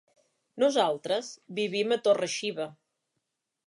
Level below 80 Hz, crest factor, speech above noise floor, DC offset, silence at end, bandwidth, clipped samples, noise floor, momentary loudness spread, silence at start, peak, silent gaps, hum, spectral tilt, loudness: -86 dBFS; 18 dB; 55 dB; under 0.1%; 0.95 s; 11.5 kHz; under 0.1%; -83 dBFS; 11 LU; 0.55 s; -12 dBFS; none; none; -3.5 dB/octave; -28 LUFS